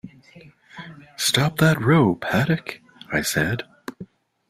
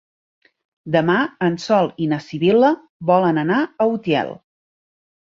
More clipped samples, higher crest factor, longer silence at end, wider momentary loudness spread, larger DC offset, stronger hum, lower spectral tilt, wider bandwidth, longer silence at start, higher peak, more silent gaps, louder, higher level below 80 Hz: neither; about the same, 20 dB vs 16 dB; second, 0.45 s vs 0.85 s; first, 22 LU vs 7 LU; neither; neither; second, -4.5 dB/octave vs -7 dB/octave; first, 16 kHz vs 7.6 kHz; second, 0.05 s vs 0.85 s; about the same, -4 dBFS vs -2 dBFS; second, none vs 2.89-3.00 s; second, -21 LUFS vs -18 LUFS; first, -52 dBFS vs -62 dBFS